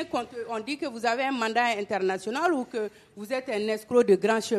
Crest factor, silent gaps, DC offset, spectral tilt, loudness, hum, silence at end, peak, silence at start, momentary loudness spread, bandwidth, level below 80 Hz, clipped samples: 18 dB; none; under 0.1%; -4.5 dB/octave; -27 LUFS; none; 0 s; -10 dBFS; 0 s; 11 LU; 13 kHz; -70 dBFS; under 0.1%